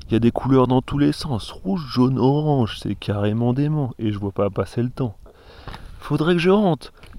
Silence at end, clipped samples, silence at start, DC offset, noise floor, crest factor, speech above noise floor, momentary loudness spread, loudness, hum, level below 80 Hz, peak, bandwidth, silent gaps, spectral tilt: 0 s; under 0.1%; 0 s; under 0.1%; -41 dBFS; 16 dB; 21 dB; 11 LU; -21 LUFS; none; -42 dBFS; -4 dBFS; 12.5 kHz; none; -8 dB/octave